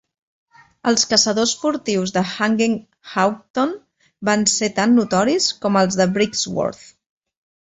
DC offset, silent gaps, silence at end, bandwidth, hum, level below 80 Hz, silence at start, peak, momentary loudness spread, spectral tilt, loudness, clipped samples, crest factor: under 0.1%; 3.50-3.54 s; 1 s; 8.4 kHz; none; -58 dBFS; 0.85 s; -2 dBFS; 9 LU; -3.5 dB/octave; -18 LUFS; under 0.1%; 18 dB